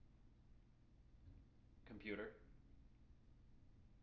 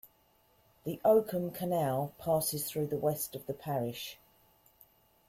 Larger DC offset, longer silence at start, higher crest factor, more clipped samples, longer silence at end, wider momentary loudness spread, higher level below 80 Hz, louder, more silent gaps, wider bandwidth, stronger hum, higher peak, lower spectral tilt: neither; second, 0 s vs 0.85 s; about the same, 24 dB vs 20 dB; neither; second, 0 s vs 1.15 s; first, 19 LU vs 14 LU; about the same, -70 dBFS vs -68 dBFS; second, -53 LUFS vs -33 LUFS; neither; second, 5.8 kHz vs 16.5 kHz; neither; second, -36 dBFS vs -14 dBFS; about the same, -4.5 dB/octave vs -5.5 dB/octave